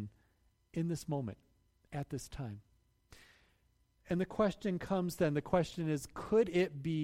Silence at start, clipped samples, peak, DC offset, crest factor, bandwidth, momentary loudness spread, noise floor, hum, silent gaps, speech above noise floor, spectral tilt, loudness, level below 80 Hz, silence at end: 0 s; under 0.1%; -18 dBFS; under 0.1%; 20 dB; 16 kHz; 14 LU; -73 dBFS; none; none; 38 dB; -6.5 dB/octave; -36 LUFS; -60 dBFS; 0 s